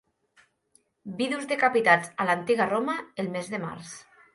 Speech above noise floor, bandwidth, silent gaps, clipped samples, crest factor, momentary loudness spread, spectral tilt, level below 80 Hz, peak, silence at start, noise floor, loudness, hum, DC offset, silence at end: 41 dB; 11.5 kHz; none; under 0.1%; 22 dB; 20 LU; -4.5 dB/octave; -72 dBFS; -6 dBFS; 1.05 s; -67 dBFS; -26 LUFS; none; under 0.1%; 0.35 s